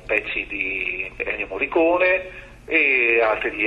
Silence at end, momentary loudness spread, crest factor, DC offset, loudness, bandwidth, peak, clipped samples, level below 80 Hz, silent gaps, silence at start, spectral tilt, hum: 0 s; 10 LU; 18 dB; under 0.1%; -20 LUFS; 9 kHz; -4 dBFS; under 0.1%; -48 dBFS; none; 0 s; -5.5 dB/octave; none